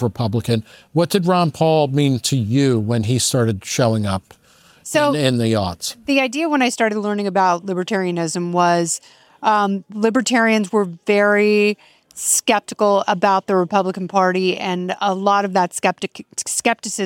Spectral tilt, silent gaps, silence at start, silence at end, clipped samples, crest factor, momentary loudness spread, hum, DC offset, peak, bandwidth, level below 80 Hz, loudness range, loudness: -4.5 dB/octave; none; 0 s; 0 s; under 0.1%; 18 dB; 7 LU; none; under 0.1%; 0 dBFS; 17 kHz; -60 dBFS; 2 LU; -18 LUFS